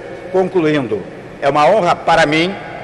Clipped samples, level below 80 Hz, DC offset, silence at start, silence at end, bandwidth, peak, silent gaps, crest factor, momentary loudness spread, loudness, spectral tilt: under 0.1%; -46 dBFS; under 0.1%; 0 s; 0 s; 11 kHz; -4 dBFS; none; 10 dB; 10 LU; -14 LUFS; -5.5 dB/octave